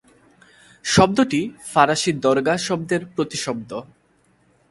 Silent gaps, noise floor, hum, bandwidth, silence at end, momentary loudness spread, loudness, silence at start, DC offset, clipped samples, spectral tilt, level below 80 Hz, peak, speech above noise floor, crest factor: none; -60 dBFS; none; 11.5 kHz; 0.9 s; 13 LU; -20 LUFS; 0.85 s; under 0.1%; under 0.1%; -4.5 dB/octave; -50 dBFS; 0 dBFS; 41 dB; 22 dB